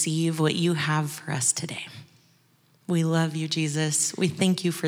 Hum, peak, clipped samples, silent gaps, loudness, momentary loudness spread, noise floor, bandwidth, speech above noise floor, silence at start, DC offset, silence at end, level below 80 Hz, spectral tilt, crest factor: none; -8 dBFS; under 0.1%; none; -25 LUFS; 8 LU; -62 dBFS; over 20 kHz; 37 dB; 0 s; under 0.1%; 0 s; -78 dBFS; -4 dB/octave; 18 dB